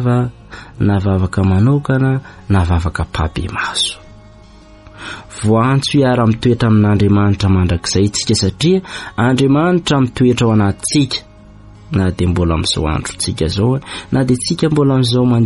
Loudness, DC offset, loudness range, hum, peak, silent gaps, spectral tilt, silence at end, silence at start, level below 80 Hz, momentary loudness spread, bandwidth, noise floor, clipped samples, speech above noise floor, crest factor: -15 LUFS; under 0.1%; 5 LU; none; -2 dBFS; none; -6 dB/octave; 0 s; 0 s; -32 dBFS; 8 LU; 11.5 kHz; -40 dBFS; under 0.1%; 26 dB; 12 dB